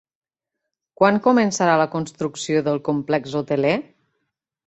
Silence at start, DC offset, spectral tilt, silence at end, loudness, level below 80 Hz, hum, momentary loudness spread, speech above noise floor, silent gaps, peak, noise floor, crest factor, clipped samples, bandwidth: 1 s; under 0.1%; -5.5 dB/octave; 0.85 s; -20 LUFS; -62 dBFS; none; 9 LU; 63 dB; none; -2 dBFS; -82 dBFS; 20 dB; under 0.1%; 8.2 kHz